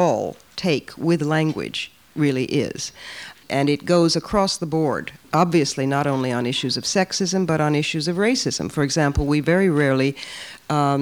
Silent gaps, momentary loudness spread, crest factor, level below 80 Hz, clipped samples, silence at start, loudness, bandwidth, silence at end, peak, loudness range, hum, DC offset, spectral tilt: none; 11 LU; 18 dB; -42 dBFS; under 0.1%; 0 s; -21 LUFS; 20 kHz; 0 s; -4 dBFS; 3 LU; none; under 0.1%; -5 dB/octave